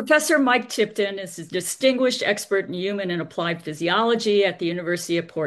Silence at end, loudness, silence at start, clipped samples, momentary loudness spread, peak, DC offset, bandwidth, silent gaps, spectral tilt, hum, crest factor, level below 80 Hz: 0 s; -22 LUFS; 0 s; under 0.1%; 9 LU; -4 dBFS; under 0.1%; 12.5 kHz; none; -3.5 dB/octave; none; 18 dB; -70 dBFS